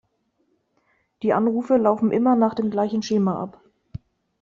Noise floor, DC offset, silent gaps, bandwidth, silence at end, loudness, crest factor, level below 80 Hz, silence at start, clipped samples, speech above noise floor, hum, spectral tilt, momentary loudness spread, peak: -69 dBFS; under 0.1%; none; 7.2 kHz; 0.45 s; -21 LUFS; 18 dB; -60 dBFS; 1.2 s; under 0.1%; 49 dB; none; -7 dB/octave; 22 LU; -6 dBFS